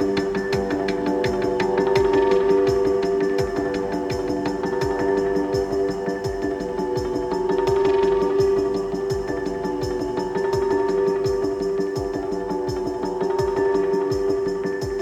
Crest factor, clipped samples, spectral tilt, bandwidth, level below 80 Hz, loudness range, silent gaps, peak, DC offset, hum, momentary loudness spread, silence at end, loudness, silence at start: 16 dB; under 0.1%; -6.5 dB/octave; 9.6 kHz; -42 dBFS; 3 LU; none; -6 dBFS; under 0.1%; none; 7 LU; 0 s; -22 LUFS; 0 s